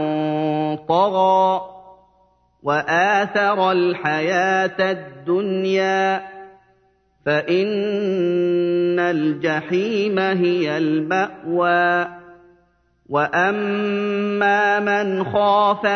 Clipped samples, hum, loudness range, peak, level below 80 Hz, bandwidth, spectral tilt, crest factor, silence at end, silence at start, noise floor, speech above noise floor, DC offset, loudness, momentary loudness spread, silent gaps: under 0.1%; 60 Hz at -65 dBFS; 2 LU; -4 dBFS; -64 dBFS; 6.6 kHz; -6 dB/octave; 16 dB; 0 s; 0 s; -60 dBFS; 42 dB; under 0.1%; -19 LUFS; 6 LU; none